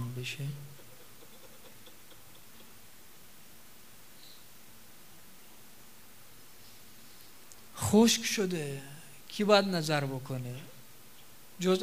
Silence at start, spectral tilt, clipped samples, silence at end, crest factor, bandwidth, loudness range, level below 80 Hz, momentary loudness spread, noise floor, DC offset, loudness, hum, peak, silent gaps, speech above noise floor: 0 s; -4.5 dB/octave; under 0.1%; 0 s; 26 dB; 16 kHz; 24 LU; -70 dBFS; 28 LU; -56 dBFS; 0.3%; -30 LUFS; none; -8 dBFS; none; 27 dB